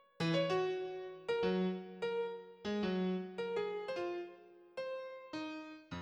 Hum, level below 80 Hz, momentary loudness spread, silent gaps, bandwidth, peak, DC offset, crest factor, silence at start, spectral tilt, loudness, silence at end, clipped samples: none; -74 dBFS; 11 LU; none; 9.4 kHz; -24 dBFS; under 0.1%; 16 dB; 0.2 s; -6.5 dB/octave; -39 LUFS; 0 s; under 0.1%